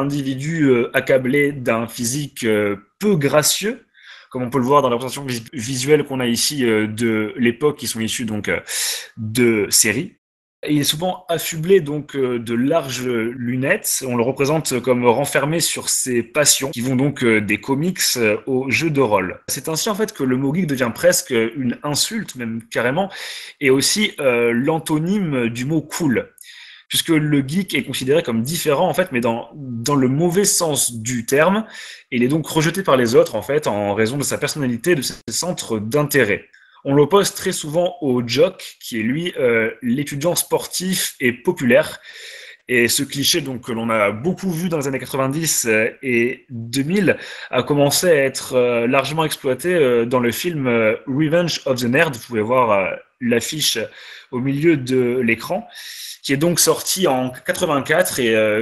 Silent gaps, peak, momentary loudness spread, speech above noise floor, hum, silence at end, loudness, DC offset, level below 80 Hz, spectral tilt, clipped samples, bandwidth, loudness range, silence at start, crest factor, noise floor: 10.18-10.63 s; 0 dBFS; 9 LU; 23 dB; none; 0 s; -18 LUFS; under 0.1%; -56 dBFS; -4 dB/octave; under 0.1%; 13 kHz; 2 LU; 0 s; 18 dB; -41 dBFS